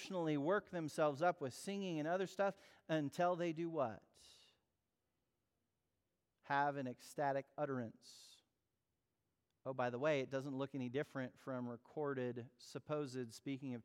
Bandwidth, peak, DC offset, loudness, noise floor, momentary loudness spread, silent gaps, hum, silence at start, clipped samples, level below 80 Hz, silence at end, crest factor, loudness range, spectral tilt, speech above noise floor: 16.5 kHz; -24 dBFS; under 0.1%; -42 LUFS; -89 dBFS; 10 LU; none; none; 0 s; under 0.1%; -88 dBFS; 0.05 s; 18 dB; 6 LU; -6 dB/octave; 48 dB